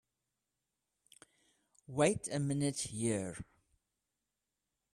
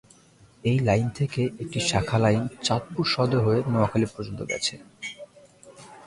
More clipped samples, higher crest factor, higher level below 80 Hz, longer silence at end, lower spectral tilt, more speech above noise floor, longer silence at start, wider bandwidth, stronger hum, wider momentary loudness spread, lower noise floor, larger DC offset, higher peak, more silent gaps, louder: neither; about the same, 24 dB vs 20 dB; second, -68 dBFS vs -50 dBFS; first, 1.5 s vs 0 s; about the same, -5 dB/octave vs -5.5 dB/octave; first, 54 dB vs 31 dB; first, 1.9 s vs 0.65 s; first, 14 kHz vs 11.5 kHz; neither; about the same, 14 LU vs 13 LU; first, -89 dBFS vs -55 dBFS; neither; second, -16 dBFS vs -6 dBFS; neither; second, -35 LUFS vs -25 LUFS